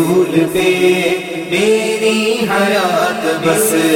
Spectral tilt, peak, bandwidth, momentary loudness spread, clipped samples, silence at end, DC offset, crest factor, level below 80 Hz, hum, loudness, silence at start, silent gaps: -4 dB/octave; 0 dBFS; 17 kHz; 4 LU; under 0.1%; 0 s; under 0.1%; 12 dB; -52 dBFS; none; -13 LUFS; 0 s; none